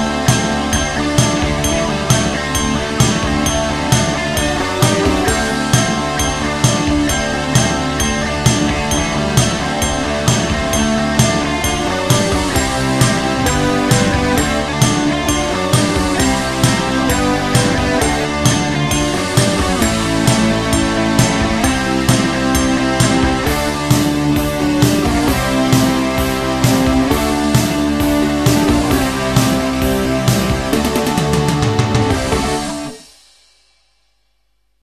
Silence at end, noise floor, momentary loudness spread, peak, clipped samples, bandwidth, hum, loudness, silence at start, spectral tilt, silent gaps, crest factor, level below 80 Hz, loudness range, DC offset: 1.8 s; -64 dBFS; 3 LU; 0 dBFS; under 0.1%; 14.5 kHz; none; -15 LUFS; 0 s; -4.5 dB/octave; none; 14 dB; -28 dBFS; 1 LU; 0.2%